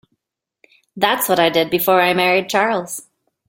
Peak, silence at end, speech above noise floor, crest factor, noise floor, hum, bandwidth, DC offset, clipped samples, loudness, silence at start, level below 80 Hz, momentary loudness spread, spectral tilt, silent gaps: -2 dBFS; 0.5 s; 62 dB; 18 dB; -78 dBFS; none; 17 kHz; under 0.1%; under 0.1%; -16 LUFS; 0.95 s; -62 dBFS; 8 LU; -3.5 dB/octave; none